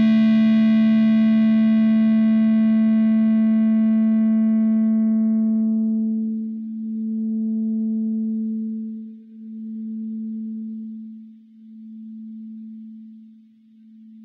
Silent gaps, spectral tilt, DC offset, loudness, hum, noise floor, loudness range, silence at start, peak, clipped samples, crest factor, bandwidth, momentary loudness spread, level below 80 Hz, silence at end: none; -10 dB/octave; under 0.1%; -19 LUFS; none; -50 dBFS; 18 LU; 0 s; -10 dBFS; under 0.1%; 10 dB; 4.5 kHz; 21 LU; -78 dBFS; 0 s